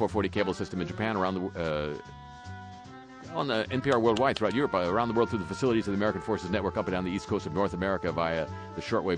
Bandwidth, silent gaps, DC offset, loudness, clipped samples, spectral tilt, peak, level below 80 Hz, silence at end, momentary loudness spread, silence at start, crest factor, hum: 10 kHz; none; under 0.1%; -29 LUFS; under 0.1%; -6.5 dB/octave; -12 dBFS; -54 dBFS; 0 s; 17 LU; 0 s; 18 dB; none